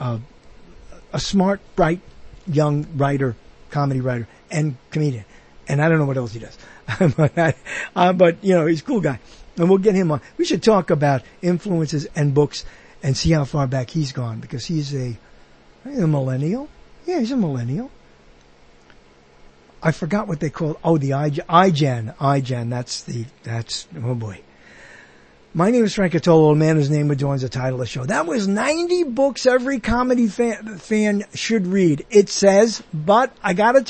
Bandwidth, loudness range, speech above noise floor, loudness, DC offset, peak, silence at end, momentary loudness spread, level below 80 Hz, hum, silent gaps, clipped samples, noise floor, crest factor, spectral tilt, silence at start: 8.8 kHz; 7 LU; 31 dB; -20 LUFS; under 0.1%; -2 dBFS; 0.05 s; 13 LU; -44 dBFS; none; none; under 0.1%; -50 dBFS; 18 dB; -6.5 dB/octave; 0 s